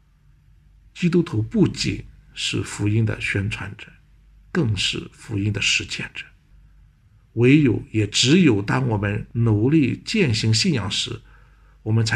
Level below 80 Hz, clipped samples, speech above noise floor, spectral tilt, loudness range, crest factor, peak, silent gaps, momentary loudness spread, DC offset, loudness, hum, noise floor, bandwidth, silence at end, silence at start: -46 dBFS; under 0.1%; 35 dB; -5 dB/octave; 6 LU; 18 dB; -2 dBFS; none; 14 LU; under 0.1%; -21 LUFS; none; -55 dBFS; 11 kHz; 0 s; 0.95 s